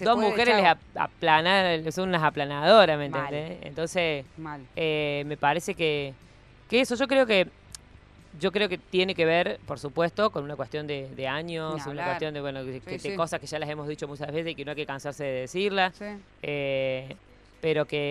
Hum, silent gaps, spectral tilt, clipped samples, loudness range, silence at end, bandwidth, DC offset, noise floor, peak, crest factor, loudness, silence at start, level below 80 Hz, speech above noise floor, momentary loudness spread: none; none; -5 dB/octave; under 0.1%; 9 LU; 0 s; 13.5 kHz; under 0.1%; -52 dBFS; -4 dBFS; 24 dB; -26 LUFS; 0 s; -58 dBFS; 26 dB; 14 LU